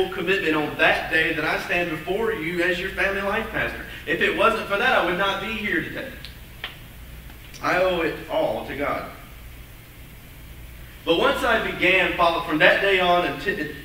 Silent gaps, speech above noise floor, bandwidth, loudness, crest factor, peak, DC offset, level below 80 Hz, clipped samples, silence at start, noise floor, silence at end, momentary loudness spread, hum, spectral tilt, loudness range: none; 20 dB; 16 kHz; -21 LUFS; 22 dB; 0 dBFS; under 0.1%; -44 dBFS; under 0.1%; 0 s; -43 dBFS; 0 s; 23 LU; none; -4.5 dB/octave; 7 LU